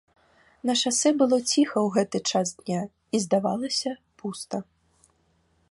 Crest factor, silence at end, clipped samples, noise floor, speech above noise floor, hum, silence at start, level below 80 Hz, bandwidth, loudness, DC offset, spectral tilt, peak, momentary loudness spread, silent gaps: 18 dB; 1.1 s; under 0.1%; -67 dBFS; 42 dB; none; 0.65 s; -68 dBFS; 11.5 kHz; -25 LUFS; under 0.1%; -3.5 dB/octave; -8 dBFS; 13 LU; none